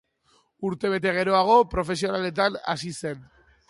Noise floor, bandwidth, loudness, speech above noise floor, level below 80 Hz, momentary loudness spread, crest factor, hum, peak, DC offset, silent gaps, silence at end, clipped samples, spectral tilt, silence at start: -65 dBFS; 11.5 kHz; -24 LUFS; 41 dB; -50 dBFS; 14 LU; 18 dB; none; -6 dBFS; under 0.1%; none; 0.45 s; under 0.1%; -5 dB/octave; 0.6 s